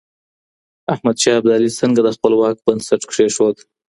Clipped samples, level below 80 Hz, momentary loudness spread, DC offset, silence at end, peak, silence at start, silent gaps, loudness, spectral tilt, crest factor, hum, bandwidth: under 0.1%; -58 dBFS; 6 LU; under 0.1%; 0.4 s; 0 dBFS; 0.9 s; none; -16 LUFS; -4.5 dB/octave; 16 dB; none; 11.5 kHz